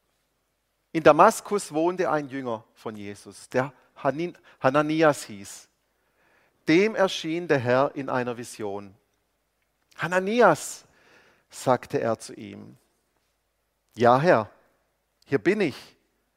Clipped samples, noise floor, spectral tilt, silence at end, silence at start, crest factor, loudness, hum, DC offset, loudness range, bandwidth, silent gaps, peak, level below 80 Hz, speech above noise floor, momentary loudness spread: under 0.1%; -74 dBFS; -5.5 dB/octave; 0.55 s; 0.95 s; 26 dB; -24 LUFS; none; under 0.1%; 4 LU; 16 kHz; none; 0 dBFS; -68 dBFS; 50 dB; 20 LU